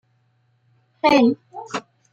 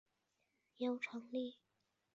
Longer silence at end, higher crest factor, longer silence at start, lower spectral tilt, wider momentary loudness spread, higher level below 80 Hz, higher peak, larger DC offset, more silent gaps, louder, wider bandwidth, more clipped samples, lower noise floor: second, 0.3 s vs 0.6 s; about the same, 18 dB vs 18 dB; first, 1.05 s vs 0.8 s; first, -5 dB/octave vs -2 dB/octave; first, 16 LU vs 4 LU; first, -62 dBFS vs under -90 dBFS; first, -4 dBFS vs -30 dBFS; neither; neither; first, -20 LUFS vs -44 LUFS; first, 8.4 kHz vs 7.6 kHz; neither; second, -64 dBFS vs -85 dBFS